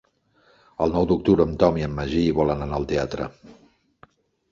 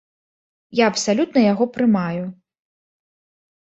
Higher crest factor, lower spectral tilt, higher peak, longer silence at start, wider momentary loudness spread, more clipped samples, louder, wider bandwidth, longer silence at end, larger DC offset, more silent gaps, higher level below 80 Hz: about the same, 22 dB vs 18 dB; first, -8 dB/octave vs -5 dB/octave; about the same, -2 dBFS vs -2 dBFS; about the same, 0.8 s vs 0.7 s; about the same, 11 LU vs 10 LU; neither; second, -22 LUFS vs -19 LUFS; second, 7.4 kHz vs 8.2 kHz; second, 1 s vs 1.35 s; neither; neither; first, -40 dBFS vs -64 dBFS